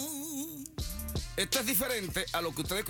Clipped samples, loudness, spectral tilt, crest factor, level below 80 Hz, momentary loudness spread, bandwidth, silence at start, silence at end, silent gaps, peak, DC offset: under 0.1%; -33 LUFS; -3 dB/octave; 20 dB; -46 dBFS; 11 LU; over 20 kHz; 0 s; 0 s; none; -14 dBFS; under 0.1%